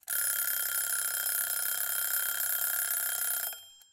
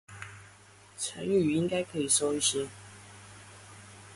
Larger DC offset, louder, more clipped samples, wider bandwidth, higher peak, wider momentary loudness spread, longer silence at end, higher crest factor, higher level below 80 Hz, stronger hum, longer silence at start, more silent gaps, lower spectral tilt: neither; about the same, -29 LUFS vs -29 LUFS; neither; first, 17 kHz vs 12 kHz; about the same, -14 dBFS vs -12 dBFS; second, 2 LU vs 23 LU; first, 0.15 s vs 0 s; about the same, 18 dB vs 20 dB; second, -72 dBFS vs -64 dBFS; neither; about the same, 0.05 s vs 0.1 s; neither; second, 3 dB/octave vs -3.5 dB/octave